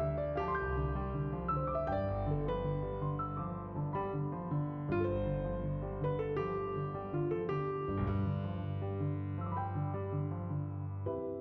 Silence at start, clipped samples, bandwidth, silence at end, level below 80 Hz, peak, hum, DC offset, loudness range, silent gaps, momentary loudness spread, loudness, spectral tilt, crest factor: 0 s; under 0.1%; 4.7 kHz; 0 s; -48 dBFS; -22 dBFS; none; under 0.1%; 1 LU; none; 4 LU; -37 LUFS; -8.5 dB/octave; 14 dB